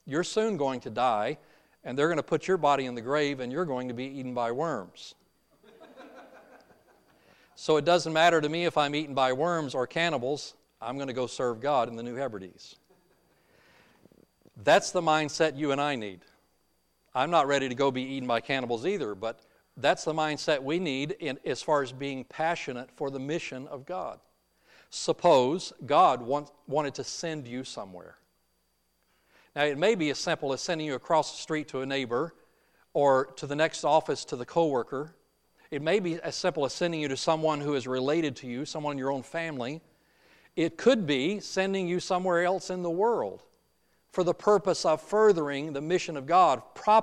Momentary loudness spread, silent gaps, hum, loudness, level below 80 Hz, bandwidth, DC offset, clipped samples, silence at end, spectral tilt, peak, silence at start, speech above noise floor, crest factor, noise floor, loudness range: 13 LU; none; none; -28 LUFS; -70 dBFS; 12.5 kHz; under 0.1%; under 0.1%; 0 s; -4.5 dB/octave; -10 dBFS; 0.05 s; 45 dB; 20 dB; -73 dBFS; 7 LU